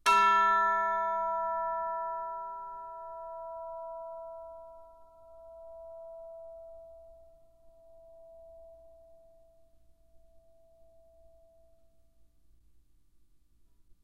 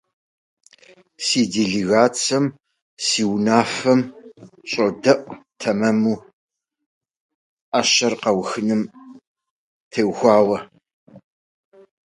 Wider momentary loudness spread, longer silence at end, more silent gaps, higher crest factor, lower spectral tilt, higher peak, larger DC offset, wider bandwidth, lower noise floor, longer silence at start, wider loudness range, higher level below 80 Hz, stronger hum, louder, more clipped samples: first, 29 LU vs 11 LU; first, 3.65 s vs 0.9 s; second, none vs 2.82-2.97 s, 6.33-6.48 s, 6.86-7.01 s, 7.20-7.72 s, 9.27-9.35 s, 9.50-9.91 s, 10.93-11.07 s; about the same, 22 dB vs 20 dB; second, -1.5 dB/octave vs -4 dB/octave; second, -14 dBFS vs 0 dBFS; neither; first, 15 kHz vs 11.5 kHz; first, -67 dBFS vs -52 dBFS; second, 0.05 s vs 1.2 s; first, 26 LU vs 3 LU; about the same, -66 dBFS vs -62 dBFS; neither; second, -31 LUFS vs -19 LUFS; neither